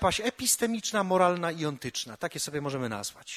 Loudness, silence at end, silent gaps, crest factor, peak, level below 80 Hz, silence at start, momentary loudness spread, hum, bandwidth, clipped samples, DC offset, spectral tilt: -29 LUFS; 0 s; none; 20 dB; -10 dBFS; -54 dBFS; 0 s; 10 LU; none; 15.5 kHz; under 0.1%; under 0.1%; -3 dB/octave